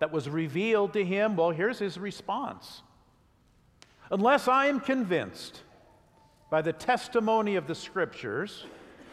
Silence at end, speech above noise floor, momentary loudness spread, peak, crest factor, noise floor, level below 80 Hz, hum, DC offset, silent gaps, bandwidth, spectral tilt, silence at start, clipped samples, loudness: 0 s; 35 dB; 14 LU; -10 dBFS; 20 dB; -63 dBFS; -68 dBFS; none; under 0.1%; none; 14.5 kHz; -5.5 dB/octave; 0 s; under 0.1%; -28 LUFS